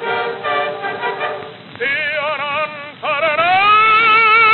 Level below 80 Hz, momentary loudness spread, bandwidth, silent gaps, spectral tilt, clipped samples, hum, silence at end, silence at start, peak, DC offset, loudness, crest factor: -70 dBFS; 14 LU; 4.8 kHz; none; -6.5 dB/octave; under 0.1%; none; 0 s; 0 s; -2 dBFS; under 0.1%; -14 LUFS; 12 dB